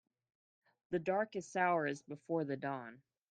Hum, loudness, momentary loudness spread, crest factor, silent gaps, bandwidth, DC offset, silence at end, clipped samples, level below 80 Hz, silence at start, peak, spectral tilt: none; -38 LUFS; 12 LU; 20 dB; none; 9.6 kHz; under 0.1%; 0.35 s; under 0.1%; -82 dBFS; 0.9 s; -20 dBFS; -6 dB/octave